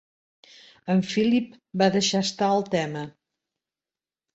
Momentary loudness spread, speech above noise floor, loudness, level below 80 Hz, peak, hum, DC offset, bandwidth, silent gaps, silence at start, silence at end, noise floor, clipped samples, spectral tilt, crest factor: 13 LU; over 66 dB; -24 LUFS; -66 dBFS; -6 dBFS; none; under 0.1%; 8.2 kHz; none; 0.85 s; 1.25 s; under -90 dBFS; under 0.1%; -5 dB/octave; 20 dB